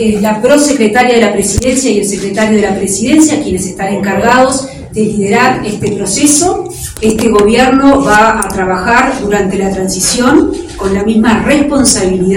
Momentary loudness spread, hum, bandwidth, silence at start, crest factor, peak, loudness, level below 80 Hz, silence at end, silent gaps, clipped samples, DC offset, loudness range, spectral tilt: 8 LU; none; over 20 kHz; 0 s; 10 dB; 0 dBFS; -9 LUFS; -30 dBFS; 0 s; none; 0.9%; under 0.1%; 2 LU; -4 dB/octave